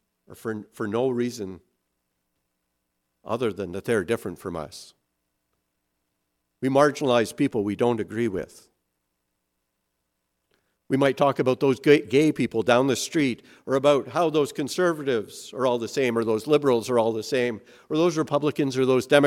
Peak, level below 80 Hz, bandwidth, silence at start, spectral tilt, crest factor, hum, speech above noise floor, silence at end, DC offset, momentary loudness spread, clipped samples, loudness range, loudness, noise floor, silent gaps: -2 dBFS; -66 dBFS; 16 kHz; 0.3 s; -5.5 dB/octave; 22 dB; none; 55 dB; 0 s; under 0.1%; 13 LU; under 0.1%; 9 LU; -24 LUFS; -78 dBFS; none